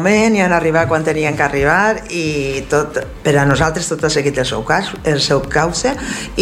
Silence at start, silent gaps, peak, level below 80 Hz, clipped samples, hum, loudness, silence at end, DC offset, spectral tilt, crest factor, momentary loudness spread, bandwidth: 0 s; none; 0 dBFS; -34 dBFS; under 0.1%; none; -15 LUFS; 0 s; under 0.1%; -4.5 dB/octave; 14 dB; 7 LU; 15.5 kHz